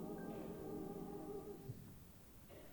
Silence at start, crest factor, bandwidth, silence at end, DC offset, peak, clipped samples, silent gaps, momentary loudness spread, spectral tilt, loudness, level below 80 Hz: 0 s; 14 dB; 19.5 kHz; 0 s; under 0.1%; -36 dBFS; under 0.1%; none; 11 LU; -7 dB/octave; -51 LUFS; -68 dBFS